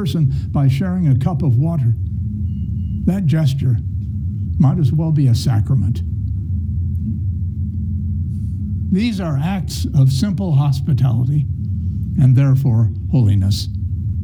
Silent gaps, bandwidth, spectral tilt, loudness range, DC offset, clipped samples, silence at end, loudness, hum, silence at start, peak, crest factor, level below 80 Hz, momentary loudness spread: none; 13.5 kHz; -8 dB/octave; 5 LU; under 0.1%; under 0.1%; 0 s; -18 LUFS; none; 0 s; -4 dBFS; 14 dB; -30 dBFS; 8 LU